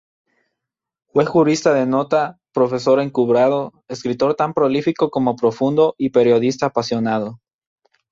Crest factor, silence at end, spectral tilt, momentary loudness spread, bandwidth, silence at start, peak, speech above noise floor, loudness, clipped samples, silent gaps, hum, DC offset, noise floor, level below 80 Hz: 16 dB; 0.75 s; -6 dB/octave; 8 LU; 7.8 kHz; 1.15 s; -2 dBFS; 66 dB; -18 LUFS; under 0.1%; none; none; under 0.1%; -83 dBFS; -60 dBFS